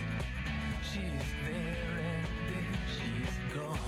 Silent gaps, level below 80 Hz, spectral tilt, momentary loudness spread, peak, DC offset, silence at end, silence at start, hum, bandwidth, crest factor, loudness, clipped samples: none; -42 dBFS; -5.5 dB/octave; 1 LU; -24 dBFS; under 0.1%; 0 s; 0 s; none; 15.5 kHz; 12 dB; -37 LUFS; under 0.1%